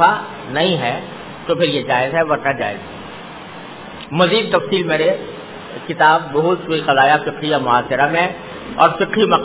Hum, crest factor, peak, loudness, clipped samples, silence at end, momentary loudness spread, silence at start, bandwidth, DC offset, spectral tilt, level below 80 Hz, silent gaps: none; 18 dB; 0 dBFS; -16 LUFS; under 0.1%; 0 s; 18 LU; 0 s; 4 kHz; 0.3%; -9 dB/octave; -52 dBFS; none